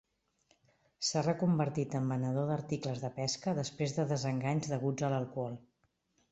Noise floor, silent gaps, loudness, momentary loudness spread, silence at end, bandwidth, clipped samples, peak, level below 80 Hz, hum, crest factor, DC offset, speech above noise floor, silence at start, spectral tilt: -77 dBFS; none; -34 LUFS; 6 LU; 0.7 s; 8.2 kHz; under 0.1%; -18 dBFS; -68 dBFS; none; 18 dB; under 0.1%; 43 dB; 1 s; -5.5 dB/octave